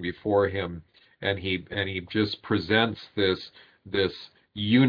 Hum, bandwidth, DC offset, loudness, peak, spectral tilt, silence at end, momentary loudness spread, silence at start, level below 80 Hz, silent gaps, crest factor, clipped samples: none; 5.2 kHz; under 0.1%; -27 LUFS; -6 dBFS; -8 dB/octave; 0 s; 11 LU; 0 s; -58 dBFS; none; 20 dB; under 0.1%